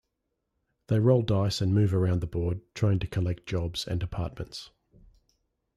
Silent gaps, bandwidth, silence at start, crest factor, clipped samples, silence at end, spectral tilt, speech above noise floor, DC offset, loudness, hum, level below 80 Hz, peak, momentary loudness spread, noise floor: none; 12.5 kHz; 0.9 s; 18 dB; under 0.1%; 1.1 s; -7 dB/octave; 54 dB; under 0.1%; -28 LUFS; none; -48 dBFS; -10 dBFS; 12 LU; -81 dBFS